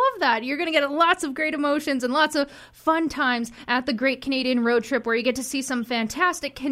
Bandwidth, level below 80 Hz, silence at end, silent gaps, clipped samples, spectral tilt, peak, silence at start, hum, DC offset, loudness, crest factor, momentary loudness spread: 16 kHz; -58 dBFS; 0 s; none; under 0.1%; -3 dB/octave; -6 dBFS; 0 s; none; under 0.1%; -23 LUFS; 18 dB; 6 LU